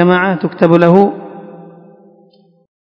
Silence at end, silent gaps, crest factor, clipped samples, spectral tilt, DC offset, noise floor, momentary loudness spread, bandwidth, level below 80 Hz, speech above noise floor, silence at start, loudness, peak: 1.3 s; none; 14 dB; 0.6%; -9.5 dB/octave; under 0.1%; -49 dBFS; 23 LU; 5.8 kHz; -54 dBFS; 39 dB; 0 s; -11 LUFS; 0 dBFS